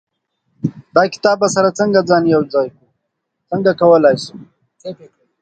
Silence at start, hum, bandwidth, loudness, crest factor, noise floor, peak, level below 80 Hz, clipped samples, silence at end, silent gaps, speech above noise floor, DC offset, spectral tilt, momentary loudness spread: 0.65 s; none; 9.2 kHz; -14 LUFS; 16 dB; -74 dBFS; 0 dBFS; -58 dBFS; under 0.1%; 0.45 s; none; 60 dB; under 0.1%; -5.5 dB/octave; 20 LU